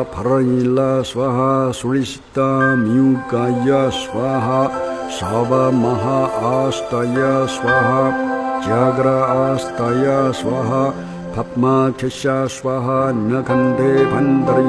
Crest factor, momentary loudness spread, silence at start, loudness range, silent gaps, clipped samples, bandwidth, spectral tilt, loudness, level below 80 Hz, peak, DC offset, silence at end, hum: 14 dB; 6 LU; 0 s; 2 LU; none; under 0.1%; 11 kHz; -6.5 dB/octave; -17 LUFS; -46 dBFS; -2 dBFS; under 0.1%; 0 s; none